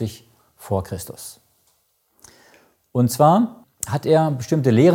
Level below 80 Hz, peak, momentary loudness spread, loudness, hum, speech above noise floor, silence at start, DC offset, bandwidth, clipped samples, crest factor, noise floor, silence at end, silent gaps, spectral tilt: -56 dBFS; -2 dBFS; 17 LU; -20 LUFS; none; 47 dB; 0 s; under 0.1%; 17 kHz; under 0.1%; 18 dB; -65 dBFS; 0 s; none; -6.5 dB/octave